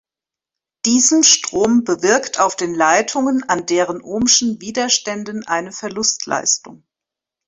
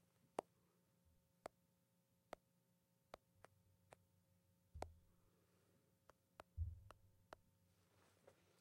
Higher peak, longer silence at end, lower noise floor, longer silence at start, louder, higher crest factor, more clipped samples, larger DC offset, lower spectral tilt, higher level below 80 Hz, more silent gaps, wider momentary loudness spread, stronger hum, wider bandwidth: first, 0 dBFS vs -28 dBFS; first, 0.7 s vs 0.3 s; first, -88 dBFS vs -83 dBFS; first, 0.85 s vs 0.4 s; first, -16 LUFS vs -59 LUFS; second, 18 dB vs 32 dB; neither; neither; second, -1.5 dB/octave vs -6 dB/octave; first, -56 dBFS vs -68 dBFS; neither; second, 10 LU vs 14 LU; neither; second, 8.4 kHz vs 16 kHz